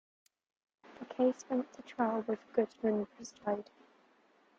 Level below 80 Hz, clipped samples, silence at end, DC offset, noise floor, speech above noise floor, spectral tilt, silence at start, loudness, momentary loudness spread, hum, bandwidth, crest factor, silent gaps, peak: -80 dBFS; under 0.1%; 0.95 s; under 0.1%; -68 dBFS; 33 dB; -6 dB/octave; 0.9 s; -36 LUFS; 13 LU; none; 7.8 kHz; 20 dB; none; -16 dBFS